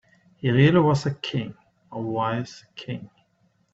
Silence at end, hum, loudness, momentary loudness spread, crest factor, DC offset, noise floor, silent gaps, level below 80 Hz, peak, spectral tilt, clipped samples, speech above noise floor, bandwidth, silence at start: 0.7 s; none; -23 LUFS; 20 LU; 20 dB; under 0.1%; -66 dBFS; none; -56 dBFS; -4 dBFS; -7 dB/octave; under 0.1%; 43 dB; 7.8 kHz; 0.45 s